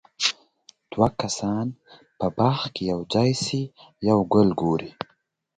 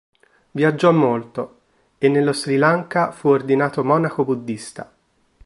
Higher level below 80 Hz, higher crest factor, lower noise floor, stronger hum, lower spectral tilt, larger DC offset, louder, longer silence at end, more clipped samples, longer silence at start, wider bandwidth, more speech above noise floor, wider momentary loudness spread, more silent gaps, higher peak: first, -54 dBFS vs -62 dBFS; about the same, 20 dB vs 18 dB; first, -67 dBFS vs -53 dBFS; neither; about the same, -5.5 dB/octave vs -6.5 dB/octave; neither; second, -24 LUFS vs -18 LUFS; about the same, 0.7 s vs 0.65 s; neither; second, 0.2 s vs 0.55 s; second, 9.4 kHz vs 11.5 kHz; first, 44 dB vs 35 dB; about the same, 16 LU vs 15 LU; neither; about the same, -4 dBFS vs -2 dBFS